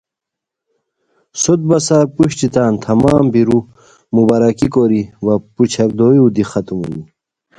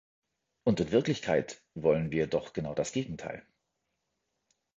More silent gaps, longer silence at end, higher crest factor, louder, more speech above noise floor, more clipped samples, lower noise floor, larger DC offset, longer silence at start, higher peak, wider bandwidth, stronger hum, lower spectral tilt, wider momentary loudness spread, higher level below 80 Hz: neither; second, 0.55 s vs 1.4 s; second, 14 dB vs 20 dB; first, -13 LUFS vs -31 LUFS; first, 70 dB vs 52 dB; neither; about the same, -82 dBFS vs -82 dBFS; neither; first, 1.35 s vs 0.65 s; first, 0 dBFS vs -12 dBFS; first, 11 kHz vs 8.2 kHz; neither; about the same, -6.5 dB/octave vs -6 dB/octave; second, 8 LU vs 13 LU; first, -44 dBFS vs -58 dBFS